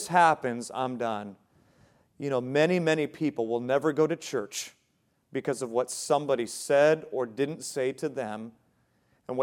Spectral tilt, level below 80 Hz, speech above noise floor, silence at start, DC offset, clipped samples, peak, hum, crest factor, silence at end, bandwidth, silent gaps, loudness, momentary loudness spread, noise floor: -4.5 dB/octave; -78 dBFS; 44 dB; 0 s; under 0.1%; under 0.1%; -8 dBFS; none; 20 dB; 0 s; 16.5 kHz; none; -28 LUFS; 14 LU; -72 dBFS